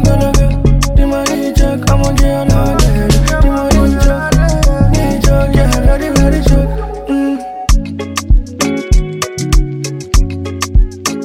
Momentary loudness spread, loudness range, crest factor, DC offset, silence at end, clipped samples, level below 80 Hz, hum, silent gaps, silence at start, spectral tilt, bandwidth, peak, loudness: 7 LU; 4 LU; 10 dB; under 0.1%; 0 s; under 0.1%; -12 dBFS; none; none; 0 s; -5.5 dB/octave; 16 kHz; 0 dBFS; -13 LUFS